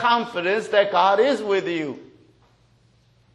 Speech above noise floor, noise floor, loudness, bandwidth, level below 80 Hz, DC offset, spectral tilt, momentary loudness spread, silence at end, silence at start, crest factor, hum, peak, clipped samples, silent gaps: 38 dB; -59 dBFS; -21 LUFS; 11 kHz; -68 dBFS; under 0.1%; -4.5 dB/octave; 11 LU; 1.3 s; 0 s; 18 dB; none; -6 dBFS; under 0.1%; none